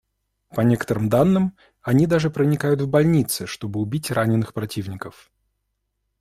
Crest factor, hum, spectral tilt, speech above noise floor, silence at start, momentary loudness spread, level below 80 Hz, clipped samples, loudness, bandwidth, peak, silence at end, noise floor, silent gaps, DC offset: 16 dB; none; -6.5 dB/octave; 55 dB; 0.55 s; 12 LU; -52 dBFS; under 0.1%; -21 LUFS; 16 kHz; -4 dBFS; 1.1 s; -75 dBFS; none; under 0.1%